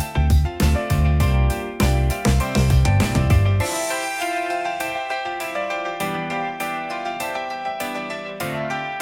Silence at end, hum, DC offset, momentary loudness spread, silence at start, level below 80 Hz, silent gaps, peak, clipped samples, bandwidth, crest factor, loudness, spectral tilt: 0 s; none; under 0.1%; 9 LU; 0 s; -26 dBFS; none; -4 dBFS; under 0.1%; 17 kHz; 16 dB; -22 LUFS; -5.5 dB/octave